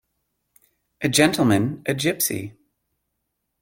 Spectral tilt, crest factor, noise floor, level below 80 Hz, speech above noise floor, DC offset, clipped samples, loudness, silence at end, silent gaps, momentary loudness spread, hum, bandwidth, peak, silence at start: -4 dB/octave; 24 dB; -77 dBFS; -58 dBFS; 57 dB; under 0.1%; under 0.1%; -21 LUFS; 1.1 s; none; 12 LU; none; 17 kHz; -2 dBFS; 1 s